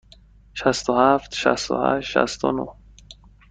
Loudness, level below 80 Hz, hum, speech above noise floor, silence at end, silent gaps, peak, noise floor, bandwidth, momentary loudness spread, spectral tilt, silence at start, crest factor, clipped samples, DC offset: -21 LUFS; -50 dBFS; none; 30 dB; 0.35 s; none; -2 dBFS; -50 dBFS; 9.4 kHz; 9 LU; -4 dB/octave; 0.55 s; 20 dB; under 0.1%; under 0.1%